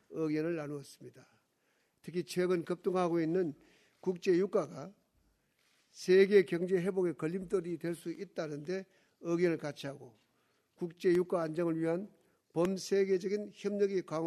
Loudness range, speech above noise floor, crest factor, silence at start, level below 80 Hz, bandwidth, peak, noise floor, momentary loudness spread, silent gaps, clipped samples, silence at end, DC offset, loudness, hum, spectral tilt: 5 LU; 43 dB; 22 dB; 0.1 s; -76 dBFS; 13 kHz; -14 dBFS; -76 dBFS; 14 LU; none; under 0.1%; 0 s; under 0.1%; -34 LUFS; none; -6.5 dB/octave